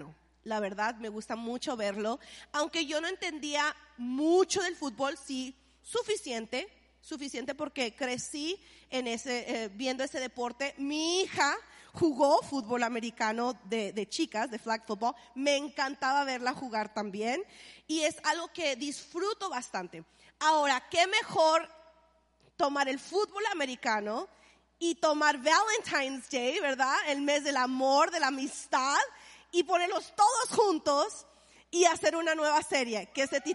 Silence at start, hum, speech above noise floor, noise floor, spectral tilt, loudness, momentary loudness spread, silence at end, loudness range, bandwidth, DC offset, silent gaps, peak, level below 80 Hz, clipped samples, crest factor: 0 s; none; 36 dB; -67 dBFS; -2 dB/octave; -31 LUFS; 11 LU; 0 s; 6 LU; 11.5 kHz; under 0.1%; none; -12 dBFS; -70 dBFS; under 0.1%; 20 dB